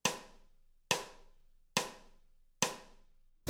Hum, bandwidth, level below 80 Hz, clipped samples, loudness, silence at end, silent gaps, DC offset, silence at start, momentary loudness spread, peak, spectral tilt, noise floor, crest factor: none; over 20 kHz; -64 dBFS; under 0.1%; -37 LUFS; 0 s; none; under 0.1%; 0.05 s; 14 LU; -12 dBFS; -1.5 dB/octave; -63 dBFS; 30 dB